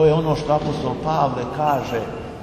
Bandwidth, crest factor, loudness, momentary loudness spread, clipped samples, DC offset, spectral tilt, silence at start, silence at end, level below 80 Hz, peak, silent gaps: 13.5 kHz; 14 dB; -21 LUFS; 6 LU; under 0.1%; under 0.1%; -7 dB/octave; 0 s; 0 s; -42 dBFS; -6 dBFS; none